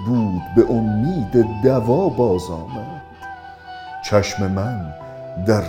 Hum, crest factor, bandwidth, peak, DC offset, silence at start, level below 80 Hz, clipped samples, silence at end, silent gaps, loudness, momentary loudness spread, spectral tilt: none; 20 dB; 16 kHz; 0 dBFS; under 0.1%; 0 s; -42 dBFS; under 0.1%; 0 s; none; -19 LUFS; 19 LU; -7 dB/octave